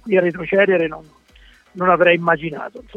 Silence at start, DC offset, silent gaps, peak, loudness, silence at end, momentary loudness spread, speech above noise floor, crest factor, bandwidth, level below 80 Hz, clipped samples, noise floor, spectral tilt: 0.05 s; under 0.1%; none; 0 dBFS; -17 LUFS; 0.15 s; 14 LU; 32 dB; 18 dB; 6.6 kHz; -52 dBFS; under 0.1%; -49 dBFS; -7.5 dB/octave